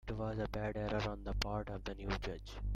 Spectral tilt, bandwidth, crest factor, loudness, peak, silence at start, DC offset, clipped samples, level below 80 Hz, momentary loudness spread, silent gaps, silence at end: -6 dB/octave; 14 kHz; 22 dB; -41 LUFS; -18 dBFS; 0.05 s; under 0.1%; under 0.1%; -46 dBFS; 6 LU; none; 0 s